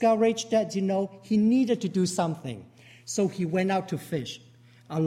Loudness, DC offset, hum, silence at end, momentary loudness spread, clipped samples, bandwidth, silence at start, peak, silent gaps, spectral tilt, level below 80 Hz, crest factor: -27 LUFS; under 0.1%; none; 0 s; 15 LU; under 0.1%; 15 kHz; 0 s; -12 dBFS; none; -6 dB/octave; -68 dBFS; 16 dB